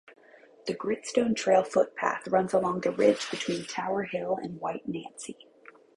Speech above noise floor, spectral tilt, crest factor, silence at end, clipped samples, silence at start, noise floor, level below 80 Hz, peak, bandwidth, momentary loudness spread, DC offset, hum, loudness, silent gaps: 28 dB; -4.5 dB/octave; 20 dB; 0.65 s; under 0.1%; 0.65 s; -56 dBFS; -70 dBFS; -8 dBFS; 11.5 kHz; 13 LU; under 0.1%; none; -28 LUFS; none